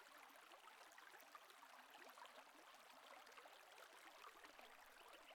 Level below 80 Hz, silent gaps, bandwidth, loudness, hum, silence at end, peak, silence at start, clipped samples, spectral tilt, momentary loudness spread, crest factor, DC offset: under -90 dBFS; none; 18 kHz; -63 LUFS; none; 0 s; -46 dBFS; 0 s; under 0.1%; 0 dB/octave; 2 LU; 18 dB; under 0.1%